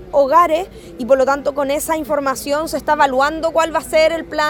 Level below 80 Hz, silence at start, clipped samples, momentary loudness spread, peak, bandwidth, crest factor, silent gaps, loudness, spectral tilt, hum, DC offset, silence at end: -44 dBFS; 0 s; under 0.1%; 7 LU; 0 dBFS; 19 kHz; 16 dB; none; -16 LUFS; -3.5 dB/octave; none; under 0.1%; 0 s